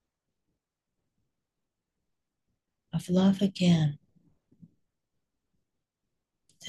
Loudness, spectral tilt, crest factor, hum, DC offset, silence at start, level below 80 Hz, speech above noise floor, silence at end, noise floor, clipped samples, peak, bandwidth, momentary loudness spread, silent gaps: -27 LUFS; -7 dB/octave; 18 dB; none; under 0.1%; 2.95 s; -68 dBFS; 61 dB; 0 s; -86 dBFS; under 0.1%; -14 dBFS; 12 kHz; 13 LU; none